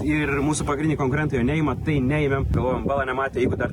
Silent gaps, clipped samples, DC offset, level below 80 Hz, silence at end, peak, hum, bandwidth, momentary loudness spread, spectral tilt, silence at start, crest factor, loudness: none; under 0.1%; under 0.1%; -34 dBFS; 0 s; -10 dBFS; none; 11.5 kHz; 2 LU; -6.5 dB/octave; 0 s; 12 dB; -23 LUFS